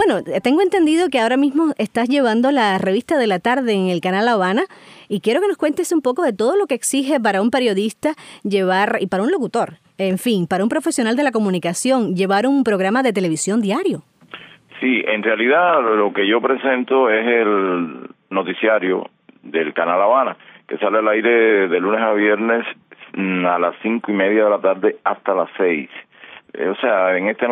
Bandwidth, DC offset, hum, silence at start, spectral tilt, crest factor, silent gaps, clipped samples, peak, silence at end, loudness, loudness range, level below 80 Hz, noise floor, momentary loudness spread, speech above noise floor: 15.5 kHz; under 0.1%; none; 0 s; -4.5 dB/octave; 14 dB; none; under 0.1%; -2 dBFS; 0 s; -17 LUFS; 3 LU; -68 dBFS; -40 dBFS; 9 LU; 23 dB